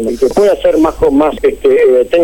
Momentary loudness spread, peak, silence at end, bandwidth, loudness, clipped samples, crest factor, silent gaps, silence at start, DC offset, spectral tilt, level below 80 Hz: 4 LU; -2 dBFS; 0 s; 17 kHz; -10 LUFS; under 0.1%; 8 dB; none; 0 s; 0.2%; -6 dB/octave; -32 dBFS